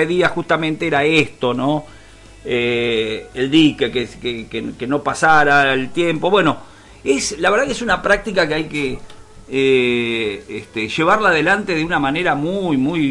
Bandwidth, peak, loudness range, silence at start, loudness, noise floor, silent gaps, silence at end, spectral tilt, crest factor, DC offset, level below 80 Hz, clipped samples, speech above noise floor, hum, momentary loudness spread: 11.5 kHz; -2 dBFS; 3 LU; 0 s; -17 LUFS; -41 dBFS; none; 0 s; -4.5 dB/octave; 14 dB; under 0.1%; -44 dBFS; under 0.1%; 24 dB; none; 11 LU